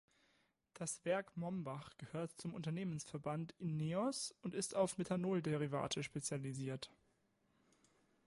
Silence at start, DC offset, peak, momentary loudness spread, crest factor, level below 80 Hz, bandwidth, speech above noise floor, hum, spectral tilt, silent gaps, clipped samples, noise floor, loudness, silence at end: 0.75 s; under 0.1%; -24 dBFS; 8 LU; 20 dB; -76 dBFS; 11.5 kHz; 37 dB; none; -5 dB/octave; none; under 0.1%; -79 dBFS; -43 LUFS; 1.4 s